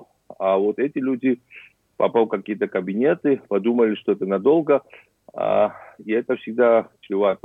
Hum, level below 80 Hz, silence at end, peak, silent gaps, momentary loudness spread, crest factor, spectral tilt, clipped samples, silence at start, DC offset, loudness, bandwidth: none; -72 dBFS; 0.1 s; -6 dBFS; none; 8 LU; 16 dB; -9 dB/octave; under 0.1%; 0.3 s; under 0.1%; -21 LUFS; 3.9 kHz